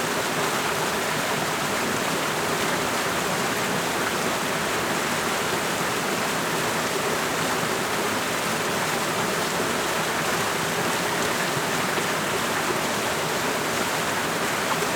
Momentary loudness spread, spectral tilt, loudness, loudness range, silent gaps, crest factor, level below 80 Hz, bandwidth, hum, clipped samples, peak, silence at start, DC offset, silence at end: 1 LU; -2.5 dB/octave; -24 LUFS; 0 LU; none; 16 dB; -56 dBFS; over 20 kHz; none; under 0.1%; -10 dBFS; 0 s; under 0.1%; 0 s